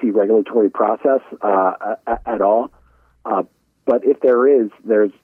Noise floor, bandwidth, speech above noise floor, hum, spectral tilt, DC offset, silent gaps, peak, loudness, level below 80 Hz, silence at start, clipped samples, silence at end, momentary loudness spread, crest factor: -46 dBFS; 3.4 kHz; 30 dB; none; -9 dB/octave; under 0.1%; none; -4 dBFS; -17 LUFS; -52 dBFS; 0 s; under 0.1%; 0.15 s; 10 LU; 12 dB